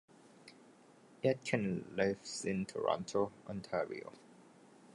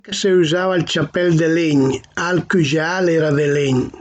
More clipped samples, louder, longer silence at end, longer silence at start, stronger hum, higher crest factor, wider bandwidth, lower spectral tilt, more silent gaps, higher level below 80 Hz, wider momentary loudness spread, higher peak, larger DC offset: neither; second, -38 LUFS vs -17 LUFS; first, 0.55 s vs 0 s; first, 0.4 s vs 0.05 s; neither; first, 22 dB vs 10 dB; first, 11.5 kHz vs 9 kHz; about the same, -5.5 dB/octave vs -5.5 dB/octave; neither; second, -72 dBFS vs -50 dBFS; first, 20 LU vs 4 LU; second, -18 dBFS vs -6 dBFS; neither